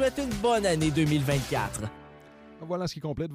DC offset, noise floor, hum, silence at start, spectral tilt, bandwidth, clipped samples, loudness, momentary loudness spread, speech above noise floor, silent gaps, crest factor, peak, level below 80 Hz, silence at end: under 0.1%; -50 dBFS; none; 0 s; -5.5 dB/octave; 15.5 kHz; under 0.1%; -28 LUFS; 11 LU; 23 dB; none; 16 dB; -12 dBFS; -46 dBFS; 0 s